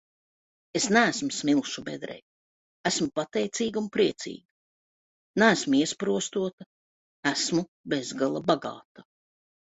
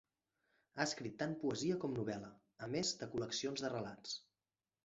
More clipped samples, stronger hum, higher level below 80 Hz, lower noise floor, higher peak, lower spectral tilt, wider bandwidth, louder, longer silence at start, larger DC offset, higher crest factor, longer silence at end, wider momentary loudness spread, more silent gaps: neither; neither; first, -68 dBFS vs -76 dBFS; about the same, under -90 dBFS vs under -90 dBFS; first, -4 dBFS vs -20 dBFS; about the same, -3.5 dB/octave vs -4 dB/octave; about the same, 8.4 kHz vs 8 kHz; first, -27 LUFS vs -42 LUFS; about the same, 0.75 s vs 0.75 s; neither; about the same, 24 dB vs 24 dB; about the same, 0.65 s vs 0.65 s; first, 16 LU vs 9 LU; first, 2.22-2.84 s, 4.45-5.34 s, 6.53-6.58 s, 6.66-7.23 s, 7.68-7.84 s, 8.85-8.95 s vs none